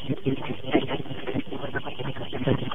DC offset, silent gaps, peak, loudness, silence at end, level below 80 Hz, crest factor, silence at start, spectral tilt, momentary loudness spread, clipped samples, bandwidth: 3%; none; -8 dBFS; -30 LUFS; 0 s; -52 dBFS; 20 dB; 0 s; -8.5 dB/octave; 7 LU; under 0.1%; 3.9 kHz